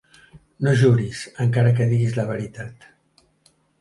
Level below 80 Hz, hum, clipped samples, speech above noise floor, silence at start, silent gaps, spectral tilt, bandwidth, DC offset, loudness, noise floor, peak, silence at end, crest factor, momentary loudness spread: -54 dBFS; none; under 0.1%; 42 dB; 0.35 s; none; -7.5 dB/octave; 11.5 kHz; under 0.1%; -20 LUFS; -61 dBFS; -6 dBFS; 1.05 s; 16 dB; 15 LU